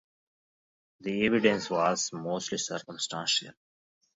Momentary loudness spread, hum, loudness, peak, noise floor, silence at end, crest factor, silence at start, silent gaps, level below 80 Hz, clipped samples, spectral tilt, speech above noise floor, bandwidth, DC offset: 10 LU; none; -29 LUFS; -8 dBFS; under -90 dBFS; 0.65 s; 24 dB; 1 s; none; -68 dBFS; under 0.1%; -3 dB/octave; over 61 dB; 8 kHz; under 0.1%